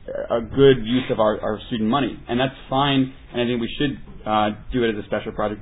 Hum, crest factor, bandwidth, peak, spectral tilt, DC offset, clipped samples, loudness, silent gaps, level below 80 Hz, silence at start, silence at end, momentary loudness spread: none; 18 dB; 4 kHz; -2 dBFS; -10 dB/octave; under 0.1%; under 0.1%; -22 LUFS; none; -40 dBFS; 0 s; 0 s; 10 LU